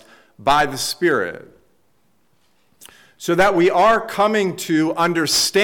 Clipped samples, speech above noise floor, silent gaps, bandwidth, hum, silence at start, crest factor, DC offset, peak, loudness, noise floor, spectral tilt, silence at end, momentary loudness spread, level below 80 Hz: under 0.1%; 47 dB; none; 19 kHz; none; 0.4 s; 12 dB; under 0.1%; -6 dBFS; -17 LUFS; -64 dBFS; -3.5 dB/octave; 0 s; 8 LU; -48 dBFS